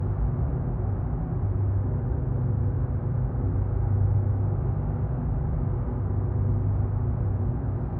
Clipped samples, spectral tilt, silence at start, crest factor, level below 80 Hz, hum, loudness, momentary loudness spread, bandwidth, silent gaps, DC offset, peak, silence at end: under 0.1%; -13 dB/octave; 0 s; 12 dB; -32 dBFS; none; -27 LUFS; 4 LU; 2.3 kHz; none; under 0.1%; -14 dBFS; 0 s